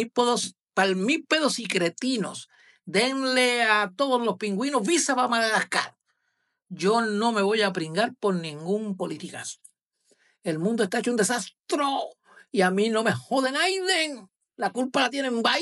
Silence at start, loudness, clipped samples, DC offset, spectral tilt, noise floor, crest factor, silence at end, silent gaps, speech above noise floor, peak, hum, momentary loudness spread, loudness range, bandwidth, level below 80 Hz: 0 s; -25 LUFS; under 0.1%; under 0.1%; -3.5 dB/octave; -76 dBFS; 18 dB; 0 s; 0.61-0.66 s, 11.59-11.63 s; 51 dB; -8 dBFS; none; 10 LU; 5 LU; 13.5 kHz; -86 dBFS